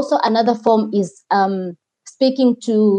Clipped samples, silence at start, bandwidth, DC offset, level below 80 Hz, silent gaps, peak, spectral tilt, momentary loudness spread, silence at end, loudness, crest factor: under 0.1%; 0 s; 9.6 kHz; under 0.1%; -78 dBFS; none; -2 dBFS; -6 dB/octave; 6 LU; 0 s; -17 LUFS; 14 dB